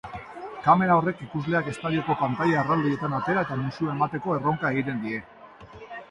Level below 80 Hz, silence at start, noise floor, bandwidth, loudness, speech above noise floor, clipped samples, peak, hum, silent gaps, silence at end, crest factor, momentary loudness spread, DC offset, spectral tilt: -58 dBFS; 0.05 s; -45 dBFS; 11 kHz; -25 LUFS; 21 dB; under 0.1%; -6 dBFS; none; none; 0.05 s; 20 dB; 16 LU; under 0.1%; -8 dB/octave